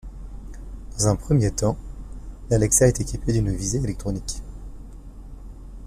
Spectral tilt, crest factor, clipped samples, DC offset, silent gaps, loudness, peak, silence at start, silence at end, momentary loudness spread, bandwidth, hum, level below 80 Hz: -5.5 dB/octave; 20 dB; under 0.1%; under 0.1%; none; -22 LUFS; -4 dBFS; 0.05 s; 0 s; 25 LU; 15 kHz; none; -34 dBFS